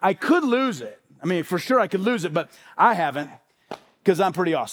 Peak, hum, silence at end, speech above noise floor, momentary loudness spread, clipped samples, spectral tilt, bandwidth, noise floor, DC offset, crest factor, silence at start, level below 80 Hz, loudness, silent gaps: -4 dBFS; none; 0 s; 20 dB; 18 LU; under 0.1%; -5.5 dB/octave; over 20 kHz; -42 dBFS; under 0.1%; 18 dB; 0 s; -74 dBFS; -22 LUFS; none